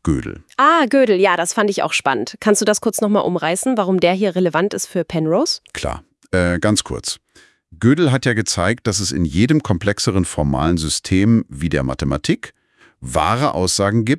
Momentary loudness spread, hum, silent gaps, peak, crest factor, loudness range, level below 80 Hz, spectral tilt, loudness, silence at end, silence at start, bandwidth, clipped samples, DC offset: 9 LU; none; none; 0 dBFS; 18 dB; 3 LU; -40 dBFS; -4.5 dB/octave; -17 LUFS; 0 s; 0.05 s; 12 kHz; under 0.1%; under 0.1%